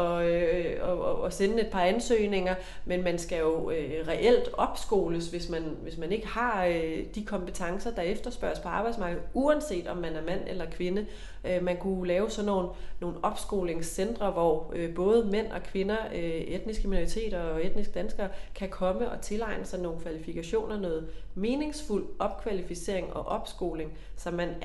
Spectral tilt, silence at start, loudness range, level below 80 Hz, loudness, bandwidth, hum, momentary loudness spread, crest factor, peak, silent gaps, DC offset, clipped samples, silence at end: -5.5 dB/octave; 0 s; 5 LU; -42 dBFS; -31 LUFS; 12.5 kHz; none; 9 LU; 18 dB; -12 dBFS; none; under 0.1%; under 0.1%; 0 s